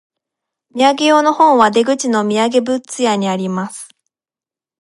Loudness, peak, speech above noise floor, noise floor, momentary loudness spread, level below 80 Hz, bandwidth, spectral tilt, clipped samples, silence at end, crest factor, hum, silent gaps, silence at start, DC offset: -14 LUFS; 0 dBFS; over 76 dB; under -90 dBFS; 12 LU; -66 dBFS; 11.5 kHz; -4 dB/octave; under 0.1%; 0.95 s; 16 dB; none; none; 0.75 s; under 0.1%